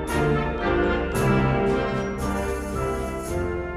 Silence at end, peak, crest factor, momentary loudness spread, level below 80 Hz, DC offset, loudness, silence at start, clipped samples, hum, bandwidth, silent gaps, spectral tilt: 0 s; -10 dBFS; 14 dB; 7 LU; -34 dBFS; under 0.1%; -24 LUFS; 0 s; under 0.1%; none; 15 kHz; none; -6.5 dB/octave